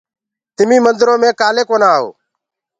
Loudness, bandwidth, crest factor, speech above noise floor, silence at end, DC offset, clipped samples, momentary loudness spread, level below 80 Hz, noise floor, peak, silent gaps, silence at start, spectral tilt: -12 LUFS; 9 kHz; 14 dB; 66 dB; 0.7 s; under 0.1%; under 0.1%; 6 LU; -62 dBFS; -78 dBFS; 0 dBFS; none; 0.6 s; -3.5 dB/octave